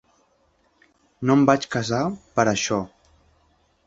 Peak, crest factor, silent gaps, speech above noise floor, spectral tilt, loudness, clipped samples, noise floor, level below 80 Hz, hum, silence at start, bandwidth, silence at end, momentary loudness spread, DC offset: -2 dBFS; 22 dB; none; 43 dB; -5 dB/octave; -22 LUFS; under 0.1%; -64 dBFS; -56 dBFS; none; 1.2 s; 7.8 kHz; 1 s; 10 LU; under 0.1%